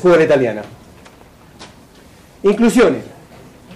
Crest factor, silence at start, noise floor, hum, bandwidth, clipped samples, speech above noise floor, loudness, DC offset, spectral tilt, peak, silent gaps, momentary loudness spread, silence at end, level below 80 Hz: 12 dB; 0 s; -44 dBFS; none; 14.5 kHz; under 0.1%; 31 dB; -14 LUFS; under 0.1%; -6 dB/octave; -6 dBFS; none; 20 LU; 0 s; -46 dBFS